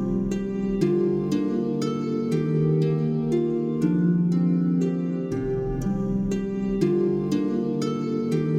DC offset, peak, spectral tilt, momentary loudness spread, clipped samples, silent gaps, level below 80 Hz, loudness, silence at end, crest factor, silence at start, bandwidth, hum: under 0.1%; -10 dBFS; -8.5 dB/octave; 5 LU; under 0.1%; none; -44 dBFS; -24 LUFS; 0 s; 14 dB; 0 s; 9.8 kHz; none